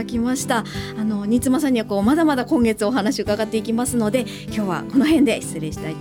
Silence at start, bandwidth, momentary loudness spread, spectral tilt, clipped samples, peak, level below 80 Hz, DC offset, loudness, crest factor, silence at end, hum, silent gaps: 0 s; 18 kHz; 8 LU; -5 dB/octave; under 0.1%; -6 dBFS; -44 dBFS; under 0.1%; -20 LUFS; 14 dB; 0 s; none; none